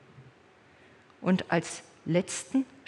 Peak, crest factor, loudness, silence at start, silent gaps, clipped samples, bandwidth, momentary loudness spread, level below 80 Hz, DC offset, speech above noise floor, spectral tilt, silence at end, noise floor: -10 dBFS; 22 dB; -30 LUFS; 0.15 s; none; under 0.1%; 11.5 kHz; 10 LU; -74 dBFS; under 0.1%; 30 dB; -5.5 dB/octave; 0.25 s; -59 dBFS